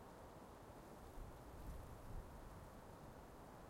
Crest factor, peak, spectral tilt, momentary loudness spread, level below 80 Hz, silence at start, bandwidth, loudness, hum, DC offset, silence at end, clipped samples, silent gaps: 16 dB; -40 dBFS; -6 dB/octave; 3 LU; -60 dBFS; 0 s; 16 kHz; -58 LUFS; none; under 0.1%; 0 s; under 0.1%; none